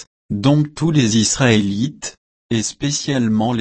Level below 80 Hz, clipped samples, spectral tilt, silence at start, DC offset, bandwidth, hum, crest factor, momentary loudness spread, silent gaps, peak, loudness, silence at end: -46 dBFS; under 0.1%; -4.5 dB/octave; 0 s; under 0.1%; 8.8 kHz; none; 16 dB; 9 LU; 0.07-0.29 s, 2.17-2.49 s; -2 dBFS; -17 LUFS; 0 s